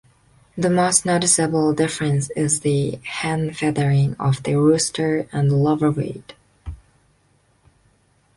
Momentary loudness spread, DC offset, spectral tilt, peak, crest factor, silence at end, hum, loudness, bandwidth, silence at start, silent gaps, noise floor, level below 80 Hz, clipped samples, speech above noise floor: 12 LU; under 0.1%; -5 dB/octave; -2 dBFS; 20 dB; 1.6 s; none; -19 LUFS; 11.5 kHz; 0.55 s; none; -61 dBFS; -48 dBFS; under 0.1%; 41 dB